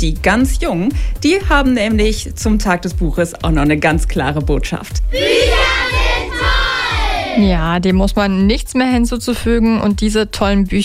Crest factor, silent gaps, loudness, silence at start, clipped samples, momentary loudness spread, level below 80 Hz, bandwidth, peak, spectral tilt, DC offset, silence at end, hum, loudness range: 12 dB; none; -15 LUFS; 0 s; under 0.1%; 5 LU; -20 dBFS; 15.5 kHz; 0 dBFS; -5 dB/octave; under 0.1%; 0 s; none; 1 LU